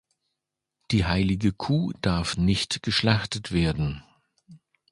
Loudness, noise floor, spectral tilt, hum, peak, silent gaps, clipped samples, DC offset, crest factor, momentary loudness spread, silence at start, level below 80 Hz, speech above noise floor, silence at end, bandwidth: -25 LUFS; -84 dBFS; -5.5 dB/octave; none; -4 dBFS; none; under 0.1%; under 0.1%; 22 dB; 5 LU; 0.9 s; -40 dBFS; 60 dB; 0.35 s; 11.5 kHz